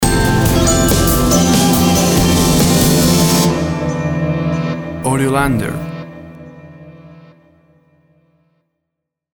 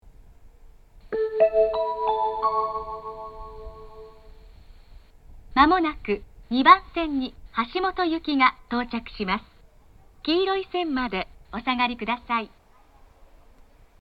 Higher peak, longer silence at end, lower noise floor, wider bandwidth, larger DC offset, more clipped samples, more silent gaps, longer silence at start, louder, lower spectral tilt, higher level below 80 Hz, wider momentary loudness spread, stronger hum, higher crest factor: about the same, 0 dBFS vs 0 dBFS; first, 2.2 s vs 1.55 s; first, -78 dBFS vs -53 dBFS; first, over 20 kHz vs 6 kHz; neither; neither; neither; about the same, 0 s vs 0.05 s; first, -13 LUFS vs -24 LUFS; second, -4.5 dB/octave vs -6.5 dB/octave; first, -26 dBFS vs -48 dBFS; second, 10 LU vs 17 LU; neither; second, 14 dB vs 26 dB